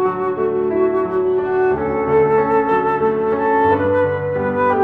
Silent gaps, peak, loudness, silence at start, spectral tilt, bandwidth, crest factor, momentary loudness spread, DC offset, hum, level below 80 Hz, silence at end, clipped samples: none; -4 dBFS; -17 LUFS; 0 s; -9.5 dB/octave; 4.5 kHz; 12 dB; 4 LU; under 0.1%; none; -46 dBFS; 0 s; under 0.1%